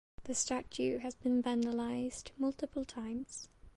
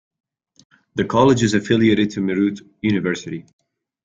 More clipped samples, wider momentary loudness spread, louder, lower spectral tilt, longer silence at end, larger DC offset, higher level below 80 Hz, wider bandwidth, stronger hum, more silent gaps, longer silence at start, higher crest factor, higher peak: neither; second, 8 LU vs 13 LU; second, -37 LUFS vs -18 LUFS; second, -3.5 dB/octave vs -6 dB/octave; second, 0.05 s vs 0.65 s; neither; second, -62 dBFS vs -52 dBFS; first, 11.5 kHz vs 9.2 kHz; neither; neither; second, 0.2 s vs 0.95 s; about the same, 16 dB vs 18 dB; second, -20 dBFS vs -2 dBFS